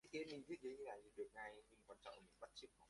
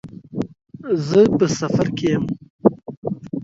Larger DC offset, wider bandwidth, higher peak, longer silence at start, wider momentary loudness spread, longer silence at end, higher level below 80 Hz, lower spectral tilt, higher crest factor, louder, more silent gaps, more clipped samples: neither; first, 11.5 kHz vs 7.8 kHz; second, -38 dBFS vs 0 dBFS; about the same, 0.05 s vs 0.05 s; second, 10 LU vs 15 LU; about the same, 0 s vs 0 s; second, -82 dBFS vs -52 dBFS; second, -4 dB/octave vs -6.5 dB/octave; about the same, 18 dB vs 20 dB; second, -55 LUFS vs -20 LUFS; second, none vs 2.50-2.59 s, 2.97-3.02 s; neither